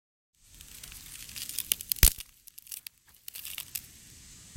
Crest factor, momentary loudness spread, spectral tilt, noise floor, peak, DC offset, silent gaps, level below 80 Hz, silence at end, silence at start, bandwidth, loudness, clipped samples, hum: 34 dB; 26 LU; -1 dB/octave; -52 dBFS; 0 dBFS; under 0.1%; none; -38 dBFS; 0 s; 0.65 s; 17 kHz; -30 LUFS; under 0.1%; none